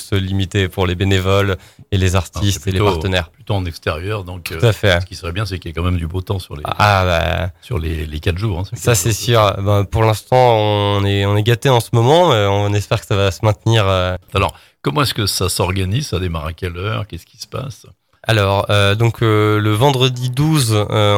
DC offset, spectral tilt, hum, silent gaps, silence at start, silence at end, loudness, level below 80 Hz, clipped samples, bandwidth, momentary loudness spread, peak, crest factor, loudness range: under 0.1%; -5 dB/octave; none; none; 0 s; 0 s; -16 LUFS; -36 dBFS; under 0.1%; 16.5 kHz; 10 LU; 0 dBFS; 16 dB; 6 LU